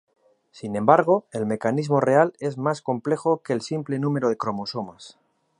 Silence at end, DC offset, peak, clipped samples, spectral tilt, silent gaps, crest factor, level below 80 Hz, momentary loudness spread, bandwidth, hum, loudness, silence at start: 0.5 s; under 0.1%; -2 dBFS; under 0.1%; -7 dB/octave; none; 22 dB; -68 dBFS; 12 LU; 11 kHz; none; -23 LUFS; 0.55 s